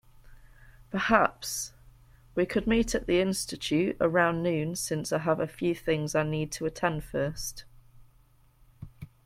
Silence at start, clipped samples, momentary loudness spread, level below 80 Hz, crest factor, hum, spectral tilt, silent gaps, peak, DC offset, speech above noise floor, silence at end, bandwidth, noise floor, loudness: 0.25 s; under 0.1%; 12 LU; -50 dBFS; 22 dB; none; -4.5 dB/octave; none; -8 dBFS; under 0.1%; 33 dB; 0.2 s; 16.5 kHz; -61 dBFS; -29 LUFS